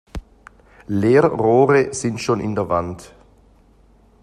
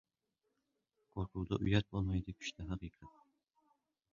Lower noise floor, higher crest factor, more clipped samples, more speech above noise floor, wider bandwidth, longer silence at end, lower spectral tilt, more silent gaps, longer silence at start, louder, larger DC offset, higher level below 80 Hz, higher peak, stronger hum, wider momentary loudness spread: second, -52 dBFS vs -87 dBFS; second, 18 dB vs 24 dB; neither; second, 35 dB vs 48 dB; first, 11.5 kHz vs 7.2 kHz; about the same, 1.15 s vs 1.05 s; about the same, -6.5 dB/octave vs -6 dB/octave; neither; second, 0.15 s vs 1.15 s; first, -18 LUFS vs -39 LUFS; neither; first, -44 dBFS vs -54 dBFS; first, -2 dBFS vs -18 dBFS; neither; first, 20 LU vs 12 LU